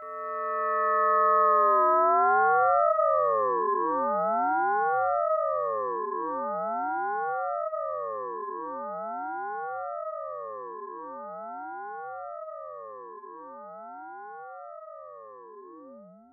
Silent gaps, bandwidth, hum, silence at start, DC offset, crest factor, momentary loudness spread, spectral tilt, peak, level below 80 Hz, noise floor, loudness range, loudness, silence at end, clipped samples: none; 2.8 kHz; none; 0 s; under 0.1%; 16 dB; 22 LU; 2.5 dB/octave; -12 dBFS; -76 dBFS; -49 dBFS; 19 LU; -26 LUFS; 0.15 s; under 0.1%